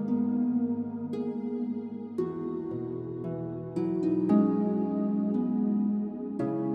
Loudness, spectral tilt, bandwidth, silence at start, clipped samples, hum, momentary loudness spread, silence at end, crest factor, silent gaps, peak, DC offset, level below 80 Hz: -30 LUFS; -11 dB/octave; 4.9 kHz; 0 s; under 0.1%; none; 10 LU; 0 s; 16 dB; none; -12 dBFS; under 0.1%; -70 dBFS